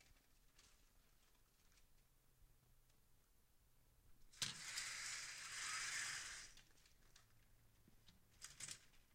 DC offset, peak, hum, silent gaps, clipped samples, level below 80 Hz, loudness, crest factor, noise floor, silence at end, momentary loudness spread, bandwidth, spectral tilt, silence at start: under 0.1%; -28 dBFS; none; none; under 0.1%; -74 dBFS; -48 LUFS; 28 dB; -74 dBFS; 0 s; 15 LU; 16 kHz; 1 dB/octave; 0 s